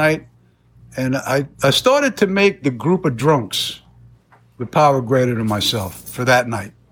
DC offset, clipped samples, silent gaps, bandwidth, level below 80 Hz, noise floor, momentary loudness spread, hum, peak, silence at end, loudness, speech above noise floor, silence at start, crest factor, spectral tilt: under 0.1%; under 0.1%; none; over 20 kHz; -50 dBFS; -52 dBFS; 10 LU; none; -2 dBFS; 0.2 s; -17 LUFS; 35 dB; 0 s; 16 dB; -5 dB/octave